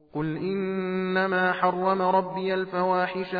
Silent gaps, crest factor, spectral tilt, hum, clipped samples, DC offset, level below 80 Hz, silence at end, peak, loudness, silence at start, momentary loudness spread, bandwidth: none; 16 dB; -9 dB/octave; none; under 0.1%; under 0.1%; -64 dBFS; 0 s; -10 dBFS; -25 LUFS; 0.15 s; 6 LU; 5 kHz